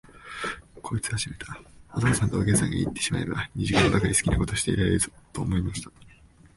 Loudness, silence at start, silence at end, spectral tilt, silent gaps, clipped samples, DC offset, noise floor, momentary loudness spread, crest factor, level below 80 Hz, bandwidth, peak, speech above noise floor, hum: -26 LUFS; 0.15 s; 0.5 s; -4.5 dB/octave; none; under 0.1%; under 0.1%; -53 dBFS; 15 LU; 20 dB; -40 dBFS; 12 kHz; -6 dBFS; 28 dB; none